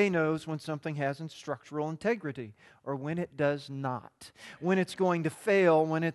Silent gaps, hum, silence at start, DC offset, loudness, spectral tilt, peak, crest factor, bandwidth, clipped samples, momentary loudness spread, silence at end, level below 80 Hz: none; none; 0 s; under 0.1%; -31 LUFS; -6.5 dB/octave; -12 dBFS; 18 dB; 12.5 kHz; under 0.1%; 16 LU; 0 s; -72 dBFS